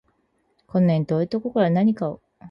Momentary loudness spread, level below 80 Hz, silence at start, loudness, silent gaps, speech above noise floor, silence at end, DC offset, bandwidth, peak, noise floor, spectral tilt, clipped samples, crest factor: 9 LU; -62 dBFS; 0.75 s; -22 LUFS; none; 47 dB; 0 s; under 0.1%; 5.8 kHz; -8 dBFS; -68 dBFS; -10 dB/octave; under 0.1%; 14 dB